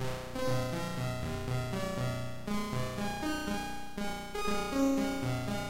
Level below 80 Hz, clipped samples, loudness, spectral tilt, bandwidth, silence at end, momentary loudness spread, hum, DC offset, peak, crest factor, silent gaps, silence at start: -48 dBFS; under 0.1%; -35 LUFS; -5.5 dB/octave; 16 kHz; 0 s; 7 LU; 60 Hz at -55 dBFS; under 0.1%; -18 dBFS; 16 dB; none; 0 s